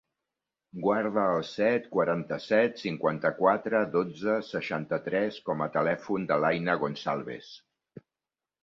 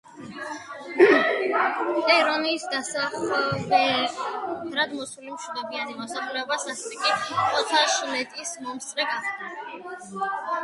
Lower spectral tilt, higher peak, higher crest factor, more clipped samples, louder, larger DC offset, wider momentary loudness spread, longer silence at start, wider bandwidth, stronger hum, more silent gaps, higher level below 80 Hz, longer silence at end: first, -7 dB/octave vs -2.5 dB/octave; second, -8 dBFS vs -4 dBFS; about the same, 20 dB vs 22 dB; neither; second, -28 LUFS vs -24 LUFS; neither; second, 7 LU vs 16 LU; first, 0.75 s vs 0.05 s; second, 7.4 kHz vs 11.5 kHz; neither; neither; about the same, -70 dBFS vs -68 dBFS; first, 0.65 s vs 0 s